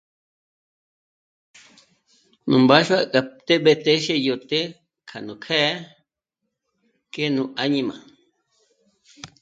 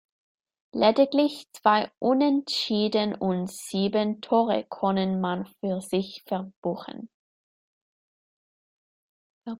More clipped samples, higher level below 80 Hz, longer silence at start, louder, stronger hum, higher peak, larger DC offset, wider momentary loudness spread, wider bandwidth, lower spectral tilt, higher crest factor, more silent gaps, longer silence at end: neither; about the same, -68 dBFS vs -68 dBFS; first, 2.45 s vs 0.75 s; first, -20 LUFS vs -25 LUFS; neither; first, 0 dBFS vs -6 dBFS; neither; first, 20 LU vs 10 LU; second, 9 kHz vs 16 kHz; about the same, -5 dB/octave vs -5.5 dB/octave; about the same, 24 dB vs 22 dB; second, none vs 1.97-2.01 s, 6.56-6.62 s, 7.14-9.41 s; first, 0.15 s vs 0 s